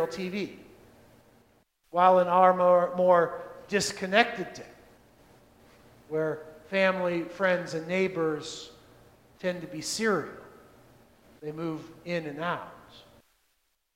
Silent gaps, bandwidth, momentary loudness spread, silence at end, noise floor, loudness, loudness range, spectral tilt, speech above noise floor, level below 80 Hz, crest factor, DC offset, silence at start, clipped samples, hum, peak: none; 15.5 kHz; 18 LU; 0.95 s; -74 dBFS; -27 LUFS; 11 LU; -4.5 dB/octave; 47 dB; -68 dBFS; 24 dB; under 0.1%; 0 s; under 0.1%; none; -4 dBFS